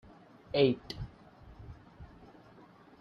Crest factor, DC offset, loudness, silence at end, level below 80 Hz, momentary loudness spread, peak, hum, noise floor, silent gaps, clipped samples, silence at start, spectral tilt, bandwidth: 24 dB; under 0.1%; -32 LUFS; 0.95 s; -58 dBFS; 28 LU; -14 dBFS; none; -57 dBFS; none; under 0.1%; 0.55 s; -7.5 dB/octave; 6.8 kHz